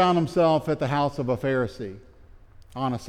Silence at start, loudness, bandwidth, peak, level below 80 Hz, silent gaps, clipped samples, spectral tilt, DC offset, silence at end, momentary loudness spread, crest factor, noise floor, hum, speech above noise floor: 0 s; -24 LUFS; 14.5 kHz; -10 dBFS; -50 dBFS; none; under 0.1%; -7 dB/octave; under 0.1%; 0 s; 16 LU; 16 dB; -49 dBFS; none; 26 dB